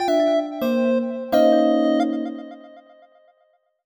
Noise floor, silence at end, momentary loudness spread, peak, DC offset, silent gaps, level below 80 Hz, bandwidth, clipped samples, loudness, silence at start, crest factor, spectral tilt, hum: -64 dBFS; 1.05 s; 13 LU; -6 dBFS; under 0.1%; none; -66 dBFS; over 20 kHz; under 0.1%; -20 LUFS; 0 s; 16 dB; -5.5 dB/octave; none